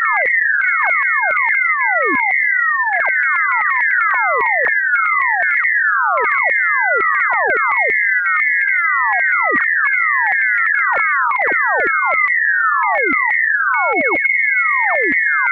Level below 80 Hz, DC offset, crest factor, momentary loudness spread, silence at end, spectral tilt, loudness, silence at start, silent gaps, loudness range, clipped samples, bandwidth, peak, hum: -64 dBFS; under 0.1%; 10 dB; 1 LU; 0 s; -6 dB/octave; -13 LUFS; 0 s; none; 0 LU; under 0.1%; 4.7 kHz; -4 dBFS; none